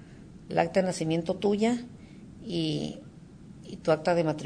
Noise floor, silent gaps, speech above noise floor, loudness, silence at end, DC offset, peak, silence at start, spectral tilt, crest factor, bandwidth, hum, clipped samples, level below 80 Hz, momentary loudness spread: -48 dBFS; none; 21 dB; -29 LUFS; 0 s; under 0.1%; -10 dBFS; 0 s; -6 dB/octave; 20 dB; 10 kHz; none; under 0.1%; -58 dBFS; 23 LU